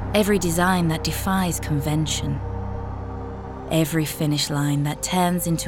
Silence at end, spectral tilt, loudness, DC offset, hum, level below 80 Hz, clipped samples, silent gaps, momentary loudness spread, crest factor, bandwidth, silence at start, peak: 0 s; -5 dB/octave; -23 LUFS; under 0.1%; none; -36 dBFS; under 0.1%; none; 12 LU; 18 dB; 18 kHz; 0 s; -6 dBFS